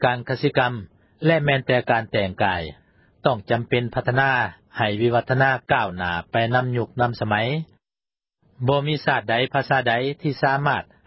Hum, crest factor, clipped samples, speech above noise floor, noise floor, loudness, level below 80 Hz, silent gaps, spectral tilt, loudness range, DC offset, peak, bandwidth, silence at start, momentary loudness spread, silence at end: none; 18 dB; under 0.1%; over 69 dB; under -90 dBFS; -22 LUFS; -50 dBFS; none; -10.5 dB/octave; 2 LU; under 0.1%; -4 dBFS; 5.8 kHz; 0 s; 6 LU; 0.25 s